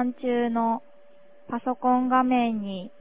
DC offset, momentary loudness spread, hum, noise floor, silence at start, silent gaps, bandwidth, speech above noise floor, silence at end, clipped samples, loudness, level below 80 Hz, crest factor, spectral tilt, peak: 0.4%; 11 LU; none; -56 dBFS; 0 s; none; 3.9 kHz; 31 dB; 0.15 s; under 0.1%; -25 LUFS; -66 dBFS; 18 dB; -10 dB/octave; -8 dBFS